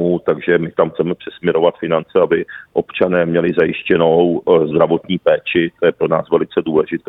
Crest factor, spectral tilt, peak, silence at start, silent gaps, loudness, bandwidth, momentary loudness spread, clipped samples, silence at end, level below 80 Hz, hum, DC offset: 14 dB; -9.5 dB/octave; 0 dBFS; 0 s; none; -16 LUFS; 4 kHz; 6 LU; under 0.1%; 0.1 s; -54 dBFS; none; under 0.1%